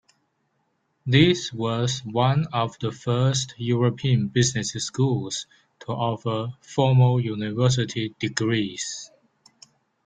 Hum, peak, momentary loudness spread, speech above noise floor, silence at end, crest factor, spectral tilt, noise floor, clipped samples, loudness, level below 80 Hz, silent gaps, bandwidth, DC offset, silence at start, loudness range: none; -4 dBFS; 12 LU; 49 dB; 1 s; 20 dB; -5.5 dB/octave; -71 dBFS; under 0.1%; -23 LUFS; -56 dBFS; none; 9.2 kHz; under 0.1%; 1.05 s; 2 LU